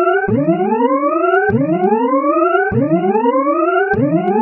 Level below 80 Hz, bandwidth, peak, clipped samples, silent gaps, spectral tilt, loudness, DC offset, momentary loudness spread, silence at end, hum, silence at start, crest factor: -50 dBFS; 3.1 kHz; 0 dBFS; under 0.1%; none; -6.5 dB/octave; -14 LUFS; under 0.1%; 1 LU; 0 s; none; 0 s; 12 dB